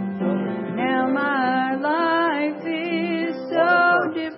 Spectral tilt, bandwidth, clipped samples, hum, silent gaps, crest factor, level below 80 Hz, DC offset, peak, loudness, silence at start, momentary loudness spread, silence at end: -10.5 dB/octave; 5.8 kHz; under 0.1%; none; none; 14 dB; -74 dBFS; under 0.1%; -6 dBFS; -21 LUFS; 0 s; 8 LU; 0 s